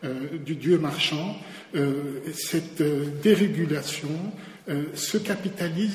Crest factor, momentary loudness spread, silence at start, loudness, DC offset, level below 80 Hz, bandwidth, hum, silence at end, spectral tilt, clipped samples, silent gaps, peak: 20 dB; 11 LU; 0 s; -26 LUFS; under 0.1%; -66 dBFS; 16 kHz; none; 0 s; -5 dB/octave; under 0.1%; none; -8 dBFS